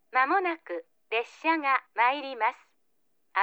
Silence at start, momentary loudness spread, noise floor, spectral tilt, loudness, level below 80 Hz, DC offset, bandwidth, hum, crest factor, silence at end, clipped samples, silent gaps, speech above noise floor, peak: 0.15 s; 10 LU; -76 dBFS; -2 dB/octave; -28 LUFS; under -90 dBFS; under 0.1%; over 20 kHz; none; 18 dB; 0 s; under 0.1%; none; 48 dB; -10 dBFS